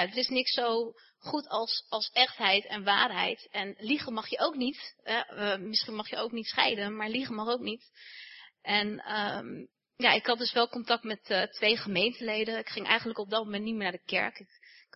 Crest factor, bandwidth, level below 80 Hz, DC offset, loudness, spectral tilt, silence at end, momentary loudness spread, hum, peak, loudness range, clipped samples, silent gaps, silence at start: 26 dB; 6 kHz; -76 dBFS; under 0.1%; -30 LUFS; -5 dB/octave; 0.5 s; 11 LU; none; -6 dBFS; 4 LU; under 0.1%; none; 0 s